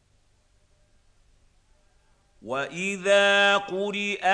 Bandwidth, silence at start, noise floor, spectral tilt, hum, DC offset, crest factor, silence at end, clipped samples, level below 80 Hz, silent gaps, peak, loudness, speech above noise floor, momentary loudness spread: 10.5 kHz; 2.45 s; -64 dBFS; -3 dB/octave; none; under 0.1%; 18 dB; 0 s; under 0.1%; -64 dBFS; none; -8 dBFS; -23 LUFS; 40 dB; 13 LU